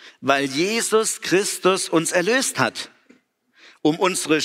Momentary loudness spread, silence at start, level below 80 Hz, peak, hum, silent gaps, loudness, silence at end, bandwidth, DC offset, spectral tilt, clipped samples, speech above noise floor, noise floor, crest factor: 5 LU; 0.05 s; -70 dBFS; -4 dBFS; none; none; -20 LUFS; 0 s; 16 kHz; under 0.1%; -3 dB/octave; under 0.1%; 38 dB; -59 dBFS; 18 dB